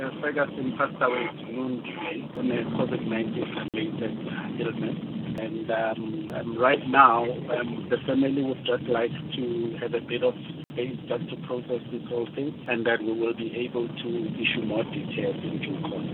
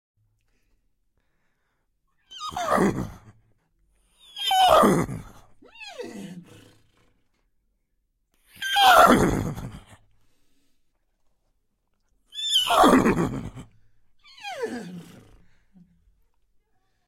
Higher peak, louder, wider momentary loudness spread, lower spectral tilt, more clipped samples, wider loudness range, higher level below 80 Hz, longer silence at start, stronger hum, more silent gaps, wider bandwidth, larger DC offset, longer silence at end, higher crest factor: about the same, -4 dBFS vs -2 dBFS; second, -28 LUFS vs -20 LUFS; second, 8 LU vs 25 LU; first, -8.5 dB/octave vs -4 dB/octave; neither; second, 7 LU vs 18 LU; second, -66 dBFS vs -48 dBFS; second, 0 s vs 2.3 s; neither; neither; second, 4.3 kHz vs 16.5 kHz; neither; second, 0 s vs 2.05 s; about the same, 24 dB vs 24 dB